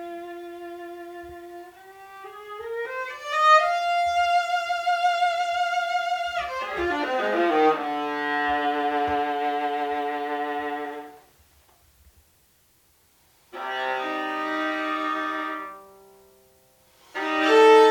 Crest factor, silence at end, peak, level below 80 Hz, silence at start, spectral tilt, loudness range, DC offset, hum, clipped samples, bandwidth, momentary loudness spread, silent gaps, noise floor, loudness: 22 dB; 0 s; -4 dBFS; -60 dBFS; 0 s; -3 dB/octave; 12 LU; under 0.1%; none; under 0.1%; 18.5 kHz; 20 LU; none; -62 dBFS; -24 LUFS